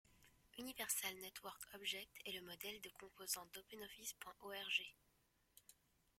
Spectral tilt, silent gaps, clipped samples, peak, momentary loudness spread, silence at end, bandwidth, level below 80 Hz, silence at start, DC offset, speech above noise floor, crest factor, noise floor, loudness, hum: 0 dB/octave; none; under 0.1%; -26 dBFS; 15 LU; 0.45 s; 16.5 kHz; -80 dBFS; 0.05 s; under 0.1%; 24 dB; 24 dB; -74 dBFS; -48 LUFS; none